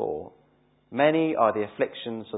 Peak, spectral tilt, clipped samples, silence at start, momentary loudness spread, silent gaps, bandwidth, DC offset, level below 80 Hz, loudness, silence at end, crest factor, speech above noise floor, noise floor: -8 dBFS; -10 dB/octave; under 0.1%; 0 s; 13 LU; none; 4 kHz; under 0.1%; -66 dBFS; -25 LUFS; 0 s; 20 dB; 39 dB; -63 dBFS